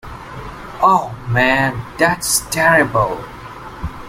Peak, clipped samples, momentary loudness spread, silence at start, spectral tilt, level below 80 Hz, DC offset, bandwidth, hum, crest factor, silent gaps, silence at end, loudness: 0 dBFS; under 0.1%; 19 LU; 0.05 s; -3.5 dB/octave; -38 dBFS; under 0.1%; 16.5 kHz; none; 18 dB; none; 0 s; -15 LUFS